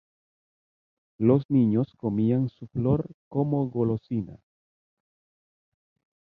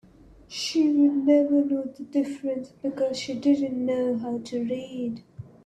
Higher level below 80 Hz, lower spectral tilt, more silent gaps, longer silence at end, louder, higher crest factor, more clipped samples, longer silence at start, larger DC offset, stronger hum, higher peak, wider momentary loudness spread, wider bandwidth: first, -56 dBFS vs -64 dBFS; first, -12.5 dB/octave vs -5 dB/octave; first, 1.45-1.49 s, 3.14-3.31 s vs none; first, 2 s vs 0.25 s; about the same, -26 LUFS vs -25 LUFS; about the same, 20 dB vs 16 dB; neither; first, 1.2 s vs 0.5 s; neither; neither; about the same, -8 dBFS vs -10 dBFS; about the same, 10 LU vs 12 LU; second, 4.7 kHz vs 9.8 kHz